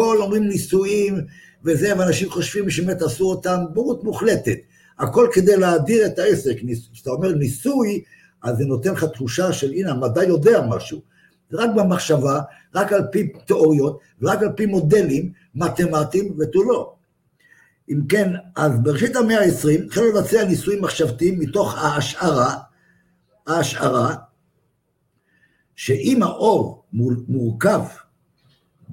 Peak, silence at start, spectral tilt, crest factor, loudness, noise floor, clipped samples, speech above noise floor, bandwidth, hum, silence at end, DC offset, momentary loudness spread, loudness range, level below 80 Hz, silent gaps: -2 dBFS; 0 s; -6 dB/octave; 16 dB; -19 LUFS; -68 dBFS; under 0.1%; 49 dB; 17 kHz; none; 0 s; under 0.1%; 10 LU; 4 LU; -52 dBFS; none